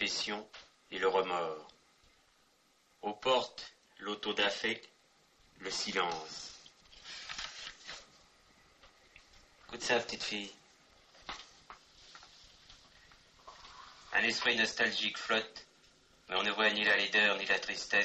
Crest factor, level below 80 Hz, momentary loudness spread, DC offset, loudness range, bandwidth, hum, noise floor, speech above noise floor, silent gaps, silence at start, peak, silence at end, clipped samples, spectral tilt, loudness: 20 dB; -70 dBFS; 24 LU; under 0.1%; 16 LU; 9 kHz; none; -70 dBFS; 36 dB; none; 0 s; -18 dBFS; 0 s; under 0.1%; -1.5 dB/octave; -33 LUFS